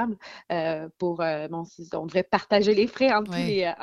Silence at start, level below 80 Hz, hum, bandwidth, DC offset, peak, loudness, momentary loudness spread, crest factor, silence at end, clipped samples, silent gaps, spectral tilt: 0 s; -62 dBFS; none; 12 kHz; under 0.1%; -6 dBFS; -25 LUFS; 13 LU; 20 dB; 0 s; under 0.1%; none; -6 dB/octave